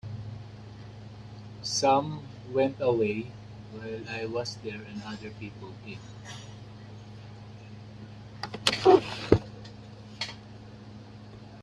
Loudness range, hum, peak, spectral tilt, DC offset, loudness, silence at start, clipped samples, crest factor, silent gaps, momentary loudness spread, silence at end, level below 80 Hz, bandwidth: 14 LU; none; -4 dBFS; -5 dB/octave; under 0.1%; -28 LUFS; 0.05 s; under 0.1%; 28 dB; none; 22 LU; 0 s; -56 dBFS; 12.5 kHz